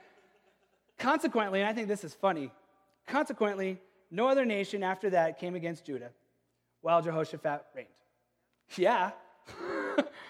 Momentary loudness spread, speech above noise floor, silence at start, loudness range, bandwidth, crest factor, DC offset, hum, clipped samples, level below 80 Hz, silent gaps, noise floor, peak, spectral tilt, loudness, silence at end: 15 LU; 46 dB; 1 s; 3 LU; 15 kHz; 20 dB; under 0.1%; none; under 0.1%; -80 dBFS; none; -77 dBFS; -12 dBFS; -5.5 dB/octave; -32 LUFS; 0 s